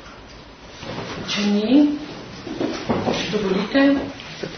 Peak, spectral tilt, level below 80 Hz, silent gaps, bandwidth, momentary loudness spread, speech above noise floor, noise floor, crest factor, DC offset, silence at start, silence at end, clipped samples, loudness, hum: -4 dBFS; -5.5 dB/octave; -50 dBFS; none; 6.6 kHz; 23 LU; 23 dB; -41 dBFS; 18 dB; under 0.1%; 0 s; 0 s; under 0.1%; -21 LUFS; none